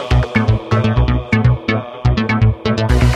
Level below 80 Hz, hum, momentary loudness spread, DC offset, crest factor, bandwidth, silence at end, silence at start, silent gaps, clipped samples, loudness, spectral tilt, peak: -20 dBFS; none; 4 LU; under 0.1%; 14 dB; 9.8 kHz; 0 s; 0 s; none; under 0.1%; -15 LUFS; -7.5 dB/octave; 0 dBFS